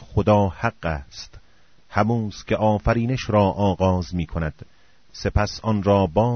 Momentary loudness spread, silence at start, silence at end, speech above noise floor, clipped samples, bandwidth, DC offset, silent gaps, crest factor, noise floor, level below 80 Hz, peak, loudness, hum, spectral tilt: 11 LU; 0 s; 0 s; 37 dB; under 0.1%; 6.6 kHz; 0.3%; none; 18 dB; -58 dBFS; -36 dBFS; -4 dBFS; -22 LUFS; none; -6.5 dB/octave